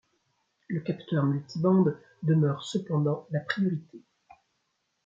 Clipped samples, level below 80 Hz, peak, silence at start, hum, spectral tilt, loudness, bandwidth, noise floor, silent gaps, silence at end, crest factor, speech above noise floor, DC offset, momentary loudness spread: under 0.1%; -74 dBFS; -12 dBFS; 0.7 s; none; -8 dB/octave; -28 LUFS; 7.6 kHz; -77 dBFS; none; 1.05 s; 18 dB; 50 dB; under 0.1%; 9 LU